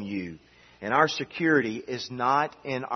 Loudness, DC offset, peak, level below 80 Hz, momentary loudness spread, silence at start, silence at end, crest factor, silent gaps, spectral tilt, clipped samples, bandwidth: -26 LUFS; under 0.1%; -6 dBFS; -68 dBFS; 11 LU; 0 s; 0 s; 22 dB; none; -5 dB/octave; under 0.1%; 6.4 kHz